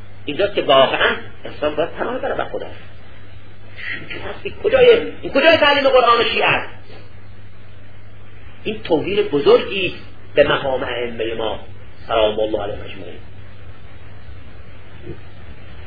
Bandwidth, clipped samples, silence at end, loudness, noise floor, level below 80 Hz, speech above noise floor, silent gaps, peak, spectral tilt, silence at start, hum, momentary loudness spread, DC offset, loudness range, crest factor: 5 kHz; under 0.1%; 0 s; -17 LUFS; -41 dBFS; -42 dBFS; 24 dB; none; 0 dBFS; -6.5 dB/octave; 0 s; none; 21 LU; 4%; 11 LU; 20 dB